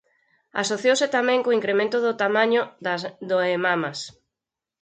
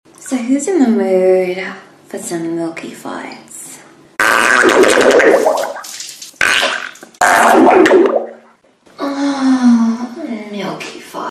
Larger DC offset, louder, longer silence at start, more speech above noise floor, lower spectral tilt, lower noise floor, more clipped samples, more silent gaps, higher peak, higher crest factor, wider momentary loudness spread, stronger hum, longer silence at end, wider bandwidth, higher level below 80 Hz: neither; second, -22 LUFS vs -12 LUFS; first, 0.55 s vs 0.2 s; first, 65 dB vs 35 dB; about the same, -3.5 dB/octave vs -3.5 dB/octave; first, -87 dBFS vs -48 dBFS; neither; neither; second, -8 dBFS vs 0 dBFS; about the same, 16 dB vs 14 dB; second, 9 LU vs 19 LU; neither; first, 0.7 s vs 0 s; second, 9.4 kHz vs 14.5 kHz; second, -74 dBFS vs -54 dBFS